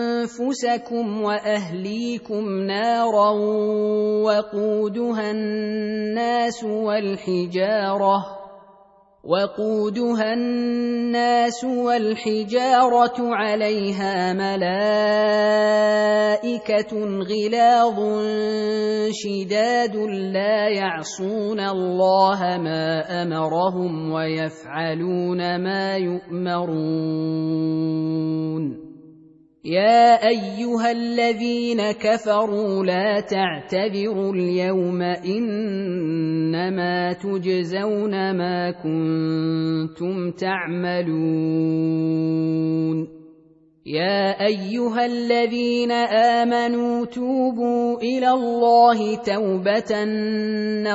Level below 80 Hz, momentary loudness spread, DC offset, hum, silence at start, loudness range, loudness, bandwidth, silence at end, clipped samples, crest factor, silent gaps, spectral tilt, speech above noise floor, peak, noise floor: -64 dBFS; 7 LU; under 0.1%; none; 0 s; 4 LU; -21 LUFS; 8 kHz; 0 s; under 0.1%; 18 dB; none; -6 dB/octave; 33 dB; -4 dBFS; -54 dBFS